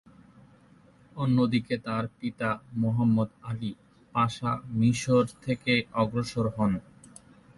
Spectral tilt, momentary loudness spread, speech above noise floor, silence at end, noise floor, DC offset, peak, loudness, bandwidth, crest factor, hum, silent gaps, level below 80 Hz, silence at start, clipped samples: -6.5 dB/octave; 10 LU; 30 dB; 0.5 s; -57 dBFS; under 0.1%; -12 dBFS; -28 LUFS; 11.5 kHz; 16 dB; none; none; -56 dBFS; 1.15 s; under 0.1%